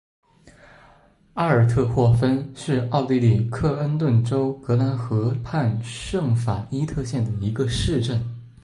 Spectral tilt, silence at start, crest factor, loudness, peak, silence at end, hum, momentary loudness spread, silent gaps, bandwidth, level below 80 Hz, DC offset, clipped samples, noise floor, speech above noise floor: -7.5 dB/octave; 0.45 s; 16 dB; -22 LUFS; -6 dBFS; 0.15 s; none; 7 LU; none; 11 kHz; -42 dBFS; under 0.1%; under 0.1%; -54 dBFS; 33 dB